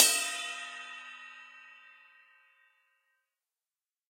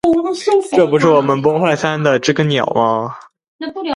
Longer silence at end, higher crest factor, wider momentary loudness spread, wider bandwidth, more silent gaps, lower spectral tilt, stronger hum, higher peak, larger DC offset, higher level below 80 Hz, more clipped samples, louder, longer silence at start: first, 2.35 s vs 0 s; first, 32 dB vs 14 dB; first, 24 LU vs 11 LU; first, 16 kHz vs 11.5 kHz; second, none vs 3.48-3.59 s; second, 5 dB/octave vs -6 dB/octave; neither; second, -6 dBFS vs 0 dBFS; neither; second, under -90 dBFS vs -54 dBFS; neither; second, -32 LUFS vs -14 LUFS; about the same, 0 s vs 0.05 s